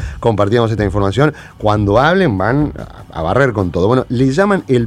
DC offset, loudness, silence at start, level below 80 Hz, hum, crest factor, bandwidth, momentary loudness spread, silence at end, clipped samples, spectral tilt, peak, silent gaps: under 0.1%; -14 LUFS; 0 s; -32 dBFS; none; 14 dB; 11.5 kHz; 7 LU; 0 s; under 0.1%; -7.5 dB/octave; 0 dBFS; none